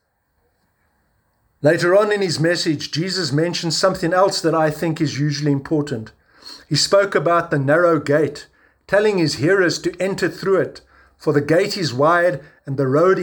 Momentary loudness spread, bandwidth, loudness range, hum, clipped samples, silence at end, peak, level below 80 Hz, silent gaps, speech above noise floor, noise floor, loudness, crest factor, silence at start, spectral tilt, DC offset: 7 LU; over 20 kHz; 2 LU; none; under 0.1%; 0 s; -2 dBFS; -56 dBFS; none; 49 dB; -66 dBFS; -18 LUFS; 16 dB; 1.65 s; -5 dB/octave; under 0.1%